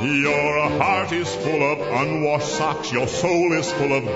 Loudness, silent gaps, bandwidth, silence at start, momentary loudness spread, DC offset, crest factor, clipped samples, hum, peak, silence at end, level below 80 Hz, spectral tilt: -21 LUFS; none; 8 kHz; 0 s; 4 LU; under 0.1%; 16 dB; under 0.1%; none; -4 dBFS; 0 s; -52 dBFS; -5 dB/octave